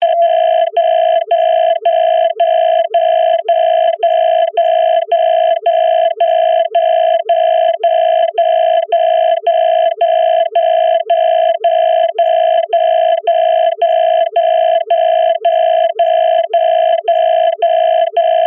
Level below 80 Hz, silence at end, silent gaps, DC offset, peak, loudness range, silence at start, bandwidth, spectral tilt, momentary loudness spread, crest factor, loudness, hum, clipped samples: -70 dBFS; 0 s; none; under 0.1%; -4 dBFS; 0 LU; 0 s; 3.6 kHz; -3 dB/octave; 1 LU; 8 dB; -12 LUFS; none; under 0.1%